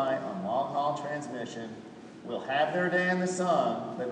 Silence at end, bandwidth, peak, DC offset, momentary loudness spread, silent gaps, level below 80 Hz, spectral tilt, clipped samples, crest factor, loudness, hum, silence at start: 0 s; 10.5 kHz; -14 dBFS; under 0.1%; 15 LU; none; -76 dBFS; -5 dB/octave; under 0.1%; 16 dB; -30 LUFS; none; 0 s